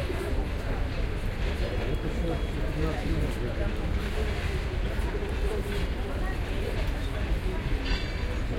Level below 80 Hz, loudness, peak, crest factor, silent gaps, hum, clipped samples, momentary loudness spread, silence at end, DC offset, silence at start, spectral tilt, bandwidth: -30 dBFS; -31 LUFS; -16 dBFS; 14 dB; none; none; under 0.1%; 2 LU; 0 s; under 0.1%; 0 s; -6.5 dB/octave; 16 kHz